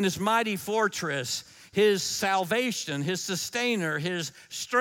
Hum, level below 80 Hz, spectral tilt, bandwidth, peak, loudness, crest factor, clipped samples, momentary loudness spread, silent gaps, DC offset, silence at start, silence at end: none; -68 dBFS; -3.5 dB/octave; 17 kHz; -10 dBFS; -27 LUFS; 18 dB; under 0.1%; 9 LU; none; under 0.1%; 0 s; 0 s